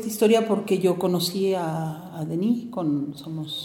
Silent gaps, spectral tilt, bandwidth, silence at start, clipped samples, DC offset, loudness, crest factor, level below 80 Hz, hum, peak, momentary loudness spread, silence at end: none; -5.5 dB/octave; 17.5 kHz; 0 s; under 0.1%; under 0.1%; -24 LUFS; 16 dB; -66 dBFS; none; -8 dBFS; 12 LU; 0 s